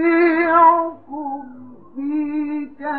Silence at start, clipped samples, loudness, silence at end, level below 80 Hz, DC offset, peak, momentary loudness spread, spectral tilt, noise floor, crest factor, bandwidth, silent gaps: 0 s; under 0.1%; -17 LUFS; 0 s; -68 dBFS; 0.4%; -2 dBFS; 19 LU; -9 dB/octave; -40 dBFS; 16 dB; 4.8 kHz; none